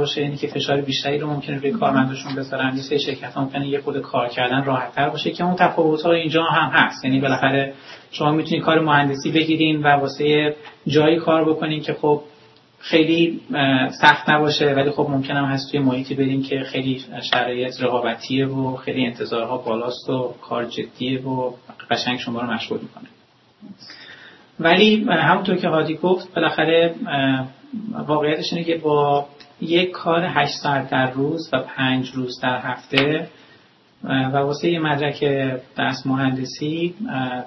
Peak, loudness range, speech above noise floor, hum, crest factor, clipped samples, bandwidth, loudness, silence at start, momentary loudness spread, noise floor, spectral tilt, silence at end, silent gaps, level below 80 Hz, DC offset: 0 dBFS; 6 LU; 33 dB; none; 20 dB; under 0.1%; 6.2 kHz; -20 LUFS; 0 s; 9 LU; -53 dBFS; -6 dB/octave; 0 s; none; -62 dBFS; under 0.1%